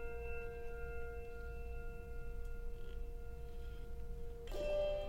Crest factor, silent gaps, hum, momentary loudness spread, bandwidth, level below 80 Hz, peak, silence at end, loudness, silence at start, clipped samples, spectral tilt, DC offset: 14 dB; none; none; 9 LU; 16 kHz; -46 dBFS; -28 dBFS; 0 s; -48 LUFS; 0 s; under 0.1%; -6 dB/octave; under 0.1%